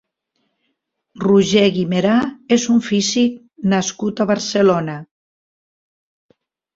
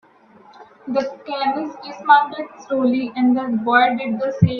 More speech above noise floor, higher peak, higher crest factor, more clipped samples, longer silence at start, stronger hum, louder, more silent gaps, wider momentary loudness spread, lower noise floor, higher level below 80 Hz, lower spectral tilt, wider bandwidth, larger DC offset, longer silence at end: first, 56 dB vs 30 dB; about the same, -2 dBFS vs 0 dBFS; about the same, 16 dB vs 20 dB; neither; first, 1.15 s vs 0.6 s; neither; about the same, -17 LUFS vs -19 LUFS; neither; second, 8 LU vs 12 LU; first, -72 dBFS vs -49 dBFS; about the same, -58 dBFS vs -56 dBFS; second, -5 dB/octave vs -7.5 dB/octave; first, 7.8 kHz vs 6.4 kHz; neither; first, 1.7 s vs 0 s